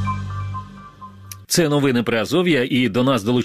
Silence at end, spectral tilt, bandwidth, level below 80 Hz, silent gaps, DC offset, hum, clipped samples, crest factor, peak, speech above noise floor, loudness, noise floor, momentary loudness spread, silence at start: 0 s; -5 dB/octave; 15 kHz; -48 dBFS; none; under 0.1%; none; under 0.1%; 16 dB; -4 dBFS; 22 dB; -19 LUFS; -39 dBFS; 21 LU; 0 s